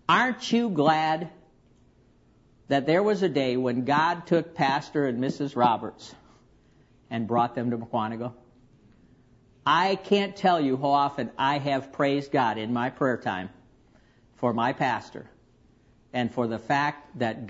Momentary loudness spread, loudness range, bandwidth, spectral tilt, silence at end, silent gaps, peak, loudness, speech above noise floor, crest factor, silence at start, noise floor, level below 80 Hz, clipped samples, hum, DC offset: 10 LU; 6 LU; 8 kHz; -6 dB/octave; 0 s; none; -8 dBFS; -26 LUFS; 34 dB; 20 dB; 0.1 s; -60 dBFS; -64 dBFS; under 0.1%; none; under 0.1%